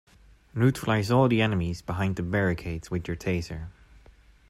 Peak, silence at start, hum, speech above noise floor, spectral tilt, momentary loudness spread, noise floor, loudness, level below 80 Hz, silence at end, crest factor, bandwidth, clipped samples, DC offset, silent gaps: -10 dBFS; 0.55 s; none; 29 dB; -7 dB/octave; 14 LU; -55 dBFS; -26 LUFS; -48 dBFS; 0.8 s; 18 dB; 15 kHz; under 0.1%; under 0.1%; none